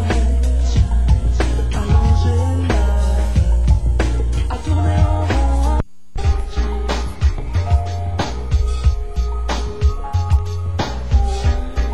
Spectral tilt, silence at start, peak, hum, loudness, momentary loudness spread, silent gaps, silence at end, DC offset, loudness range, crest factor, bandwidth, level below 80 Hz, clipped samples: -6.5 dB/octave; 0 s; -4 dBFS; none; -19 LUFS; 7 LU; none; 0 s; 3%; 4 LU; 12 dB; 10.5 kHz; -18 dBFS; under 0.1%